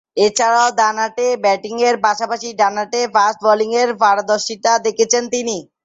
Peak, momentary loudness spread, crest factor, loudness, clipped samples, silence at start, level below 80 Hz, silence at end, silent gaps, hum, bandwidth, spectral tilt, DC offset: 0 dBFS; 6 LU; 16 dB; -16 LUFS; under 0.1%; 0.15 s; -66 dBFS; 0.2 s; none; none; 8 kHz; -1.5 dB/octave; under 0.1%